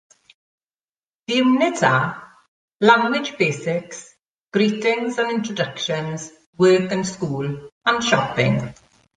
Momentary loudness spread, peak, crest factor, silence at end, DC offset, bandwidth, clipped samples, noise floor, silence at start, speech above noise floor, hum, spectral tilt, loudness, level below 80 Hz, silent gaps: 13 LU; -2 dBFS; 20 dB; 0.45 s; under 0.1%; 9.6 kHz; under 0.1%; under -90 dBFS; 1.3 s; over 71 dB; none; -5 dB/octave; -20 LUFS; -60 dBFS; 2.48-2.68 s, 2.75-2.79 s, 4.30-4.47 s, 6.46-6.53 s, 7.72-7.81 s